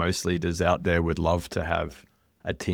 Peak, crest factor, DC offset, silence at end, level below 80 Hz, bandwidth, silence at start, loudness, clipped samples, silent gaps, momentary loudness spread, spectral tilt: -6 dBFS; 20 dB; under 0.1%; 0 s; -40 dBFS; 17 kHz; 0 s; -26 LUFS; under 0.1%; none; 11 LU; -5.5 dB/octave